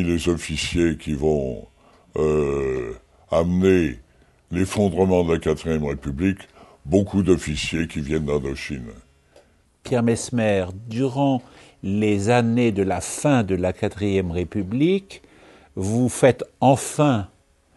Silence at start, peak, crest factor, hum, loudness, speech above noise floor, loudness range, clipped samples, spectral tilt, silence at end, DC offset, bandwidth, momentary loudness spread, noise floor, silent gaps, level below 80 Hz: 0 s; -2 dBFS; 20 dB; none; -22 LUFS; 34 dB; 3 LU; under 0.1%; -6 dB/octave; 0.5 s; under 0.1%; 12 kHz; 12 LU; -55 dBFS; none; -42 dBFS